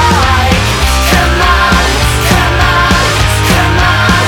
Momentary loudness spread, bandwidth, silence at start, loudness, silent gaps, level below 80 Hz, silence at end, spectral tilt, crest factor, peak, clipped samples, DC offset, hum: 2 LU; 18.5 kHz; 0 s; -8 LUFS; none; -14 dBFS; 0 s; -4 dB/octave; 8 dB; 0 dBFS; under 0.1%; under 0.1%; none